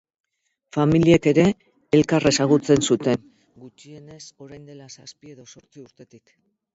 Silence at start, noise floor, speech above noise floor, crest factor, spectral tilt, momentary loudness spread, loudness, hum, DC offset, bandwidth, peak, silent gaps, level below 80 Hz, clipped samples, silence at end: 0.75 s; -66 dBFS; 45 dB; 20 dB; -5.5 dB/octave; 25 LU; -19 LUFS; none; under 0.1%; 8 kHz; -2 dBFS; none; -52 dBFS; under 0.1%; 0.7 s